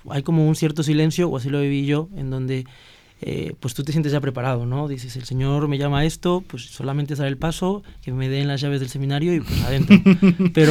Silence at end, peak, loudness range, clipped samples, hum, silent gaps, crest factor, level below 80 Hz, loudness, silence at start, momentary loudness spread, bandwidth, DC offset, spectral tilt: 0 s; 0 dBFS; 6 LU; under 0.1%; none; none; 20 dB; -40 dBFS; -21 LUFS; 0.05 s; 13 LU; 16 kHz; under 0.1%; -7 dB/octave